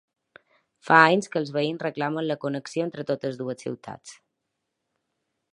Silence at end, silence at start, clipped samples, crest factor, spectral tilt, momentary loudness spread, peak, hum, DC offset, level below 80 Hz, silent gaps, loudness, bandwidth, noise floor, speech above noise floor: 1.4 s; 0.85 s; under 0.1%; 26 dB; -5.5 dB/octave; 18 LU; 0 dBFS; none; under 0.1%; -74 dBFS; none; -24 LUFS; 11.5 kHz; -81 dBFS; 56 dB